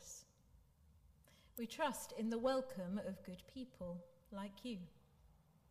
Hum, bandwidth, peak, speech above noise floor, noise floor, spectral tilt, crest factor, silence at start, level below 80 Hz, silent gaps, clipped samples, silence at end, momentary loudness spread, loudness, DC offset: none; 15.5 kHz; -28 dBFS; 25 dB; -70 dBFS; -5 dB/octave; 20 dB; 0 s; -72 dBFS; none; under 0.1%; 0.35 s; 15 LU; -45 LUFS; under 0.1%